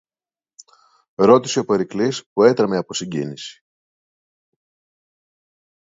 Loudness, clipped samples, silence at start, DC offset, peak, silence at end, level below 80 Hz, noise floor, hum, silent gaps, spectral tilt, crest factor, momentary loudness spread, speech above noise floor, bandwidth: -18 LUFS; under 0.1%; 1.2 s; under 0.1%; 0 dBFS; 2.45 s; -64 dBFS; under -90 dBFS; none; 2.26-2.36 s; -5 dB/octave; 22 dB; 17 LU; over 72 dB; 7.8 kHz